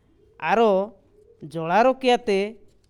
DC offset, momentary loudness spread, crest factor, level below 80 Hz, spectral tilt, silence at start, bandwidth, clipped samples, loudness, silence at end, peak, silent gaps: under 0.1%; 13 LU; 16 dB; -60 dBFS; -5.5 dB/octave; 0.4 s; 12 kHz; under 0.1%; -22 LUFS; 0.35 s; -6 dBFS; none